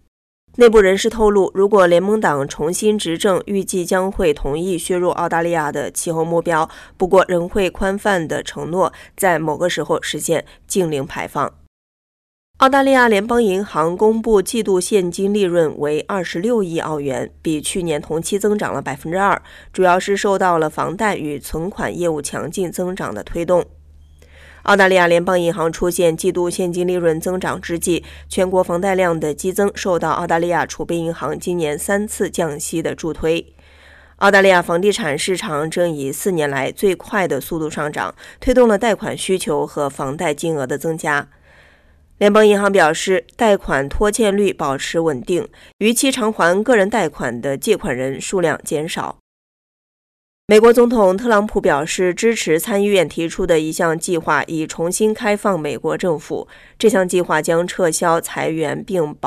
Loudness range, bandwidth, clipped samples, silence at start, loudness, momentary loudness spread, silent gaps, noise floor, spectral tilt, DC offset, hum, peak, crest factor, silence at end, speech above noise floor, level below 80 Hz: 5 LU; 14 kHz; under 0.1%; 0.6 s; -17 LUFS; 10 LU; 11.67-12.54 s, 45.73-45.79 s, 49.20-50.48 s; -50 dBFS; -4.5 dB/octave; under 0.1%; none; -2 dBFS; 14 dB; 0 s; 33 dB; -40 dBFS